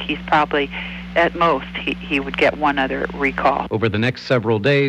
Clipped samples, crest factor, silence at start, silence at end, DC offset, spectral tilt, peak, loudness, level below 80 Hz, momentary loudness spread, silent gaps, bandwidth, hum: under 0.1%; 14 dB; 0 s; 0 s; under 0.1%; -6.5 dB/octave; -4 dBFS; -19 LUFS; -40 dBFS; 6 LU; none; 10.5 kHz; none